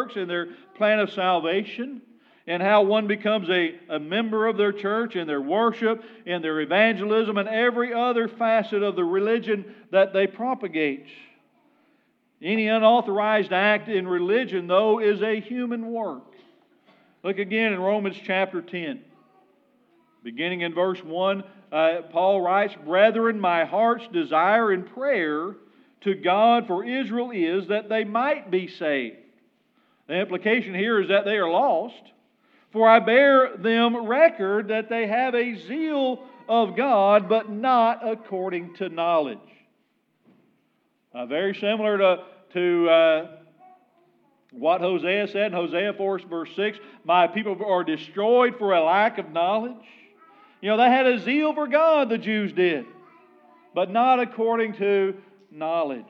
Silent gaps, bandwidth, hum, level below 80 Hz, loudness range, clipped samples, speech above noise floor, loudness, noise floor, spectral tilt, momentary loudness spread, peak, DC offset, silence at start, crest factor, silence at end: none; 6 kHz; none; under -90 dBFS; 7 LU; under 0.1%; 47 dB; -23 LUFS; -69 dBFS; -7.5 dB/octave; 11 LU; -2 dBFS; under 0.1%; 0 s; 22 dB; 0.05 s